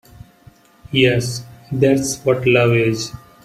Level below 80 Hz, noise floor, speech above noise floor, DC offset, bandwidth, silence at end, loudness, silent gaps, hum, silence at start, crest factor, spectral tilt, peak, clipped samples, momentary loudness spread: -48 dBFS; -48 dBFS; 32 dB; under 0.1%; 15.5 kHz; 0.25 s; -17 LUFS; none; none; 0.9 s; 18 dB; -5 dB/octave; -2 dBFS; under 0.1%; 13 LU